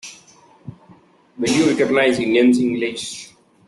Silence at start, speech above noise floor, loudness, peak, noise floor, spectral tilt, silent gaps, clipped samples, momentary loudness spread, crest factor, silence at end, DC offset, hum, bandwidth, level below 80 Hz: 0.05 s; 34 dB; -17 LUFS; -4 dBFS; -50 dBFS; -4.5 dB/octave; none; under 0.1%; 15 LU; 16 dB; 0.45 s; under 0.1%; none; 12 kHz; -58 dBFS